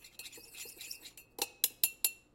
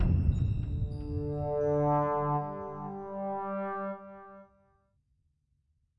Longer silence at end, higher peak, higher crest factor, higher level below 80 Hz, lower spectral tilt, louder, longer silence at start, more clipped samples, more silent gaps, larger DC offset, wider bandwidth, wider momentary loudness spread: second, 0.15 s vs 1.55 s; first, -8 dBFS vs -14 dBFS; first, 32 dB vs 18 dB; second, -74 dBFS vs -42 dBFS; second, 1.5 dB/octave vs -10.5 dB/octave; about the same, -34 LUFS vs -32 LUFS; about the same, 0 s vs 0 s; neither; neither; neither; first, 16.5 kHz vs 5.8 kHz; first, 17 LU vs 12 LU